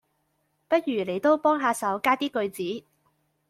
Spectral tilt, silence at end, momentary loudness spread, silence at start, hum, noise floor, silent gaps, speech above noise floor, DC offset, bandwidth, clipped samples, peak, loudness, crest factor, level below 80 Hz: -4.5 dB/octave; 0.7 s; 10 LU; 0.7 s; none; -73 dBFS; none; 48 dB; under 0.1%; 16 kHz; under 0.1%; -8 dBFS; -25 LUFS; 18 dB; -72 dBFS